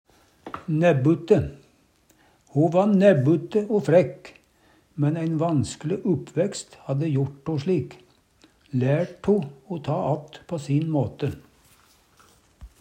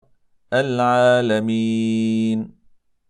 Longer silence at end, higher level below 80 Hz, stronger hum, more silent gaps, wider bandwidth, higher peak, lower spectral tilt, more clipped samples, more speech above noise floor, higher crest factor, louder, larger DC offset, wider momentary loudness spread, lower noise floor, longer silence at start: second, 0.15 s vs 0.6 s; first, -56 dBFS vs -66 dBFS; neither; neither; about the same, 9.6 kHz vs 10.5 kHz; about the same, -4 dBFS vs -4 dBFS; about the same, -7.5 dB/octave vs -6.5 dB/octave; neither; about the same, 39 dB vs 37 dB; about the same, 20 dB vs 16 dB; second, -23 LUFS vs -19 LUFS; neither; first, 14 LU vs 8 LU; first, -61 dBFS vs -55 dBFS; about the same, 0.45 s vs 0.5 s